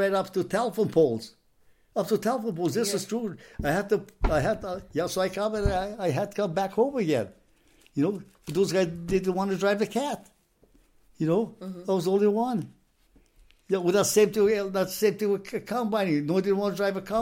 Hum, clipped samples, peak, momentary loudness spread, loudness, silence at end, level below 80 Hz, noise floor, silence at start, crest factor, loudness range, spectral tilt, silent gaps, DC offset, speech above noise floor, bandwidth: none; under 0.1%; -10 dBFS; 9 LU; -27 LUFS; 0 s; -44 dBFS; -62 dBFS; 0 s; 18 dB; 3 LU; -5.5 dB/octave; none; under 0.1%; 36 dB; 16.5 kHz